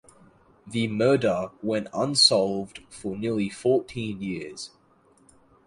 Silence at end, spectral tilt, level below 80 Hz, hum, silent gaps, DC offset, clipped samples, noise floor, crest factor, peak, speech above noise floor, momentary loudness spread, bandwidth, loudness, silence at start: 1 s; -4 dB/octave; -60 dBFS; none; none; under 0.1%; under 0.1%; -60 dBFS; 22 dB; -4 dBFS; 35 dB; 18 LU; 11.5 kHz; -24 LUFS; 0.65 s